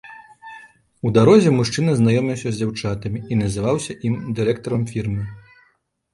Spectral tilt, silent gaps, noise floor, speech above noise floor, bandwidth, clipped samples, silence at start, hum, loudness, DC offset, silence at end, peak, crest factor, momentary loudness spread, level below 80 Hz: -6.5 dB/octave; none; -63 dBFS; 45 dB; 11.5 kHz; under 0.1%; 0.05 s; none; -19 LUFS; under 0.1%; 0.75 s; -2 dBFS; 18 dB; 16 LU; -46 dBFS